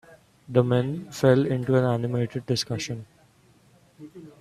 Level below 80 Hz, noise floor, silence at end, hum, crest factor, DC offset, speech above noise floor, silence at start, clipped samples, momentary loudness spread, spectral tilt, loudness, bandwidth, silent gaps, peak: -62 dBFS; -58 dBFS; 0.1 s; none; 22 dB; under 0.1%; 35 dB; 0.1 s; under 0.1%; 13 LU; -6.5 dB/octave; -24 LUFS; 13.5 kHz; none; -4 dBFS